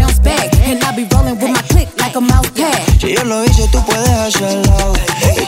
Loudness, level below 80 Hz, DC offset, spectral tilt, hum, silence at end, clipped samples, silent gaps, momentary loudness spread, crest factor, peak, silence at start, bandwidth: -12 LUFS; -14 dBFS; under 0.1%; -4.5 dB/octave; none; 0 s; 0.2%; none; 3 LU; 10 dB; 0 dBFS; 0 s; 16.5 kHz